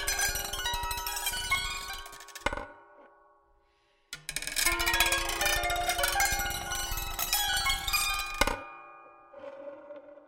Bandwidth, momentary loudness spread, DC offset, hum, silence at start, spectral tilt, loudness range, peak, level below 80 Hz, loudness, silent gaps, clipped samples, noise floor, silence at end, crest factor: 17 kHz; 19 LU; under 0.1%; none; 0 s; -0.5 dB/octave; 7 LU; -6 dBFS; -44 dBFS; -29 LUFS; none; under 0.1%; -69 dBFS; 0.1 s; 26 dB